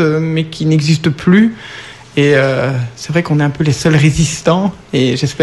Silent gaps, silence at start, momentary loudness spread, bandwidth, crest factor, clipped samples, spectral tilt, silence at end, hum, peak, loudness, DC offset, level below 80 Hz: none; 0 s; 7 LU; 12 kHz; 12 dB; under 0.1%; -6 dB/octave; 0 s; none; 0 dBFS; -13 LUFS; 0.2%; -38 dBFS